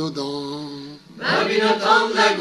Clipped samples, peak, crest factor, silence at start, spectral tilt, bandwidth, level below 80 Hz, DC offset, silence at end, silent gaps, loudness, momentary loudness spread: under 0.1%; -2 dBFS; 18 dB; 0 s; -3.5 dB/octave; 12.5 kHz; -66 dBFS; under 0.1%; 0 s; none; -19 LUFS; 18 LU